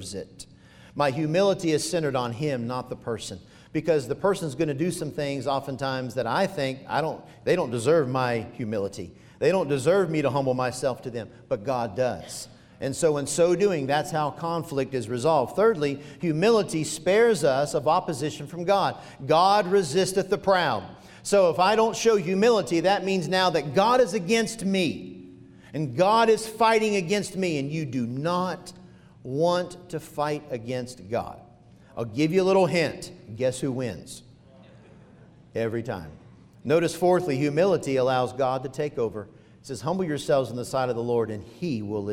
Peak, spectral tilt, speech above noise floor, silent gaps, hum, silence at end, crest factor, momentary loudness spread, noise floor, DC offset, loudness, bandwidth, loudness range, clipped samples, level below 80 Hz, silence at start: -8 dBFS; -5 dB/octave; 27 dB; none; none; 0 s; 16 dB; 14 LU; -52 dBFS; under 0.1%; -25 LUFS; 16 kHz; 6 LU; under 0.1%; -60 dBFS; 0 s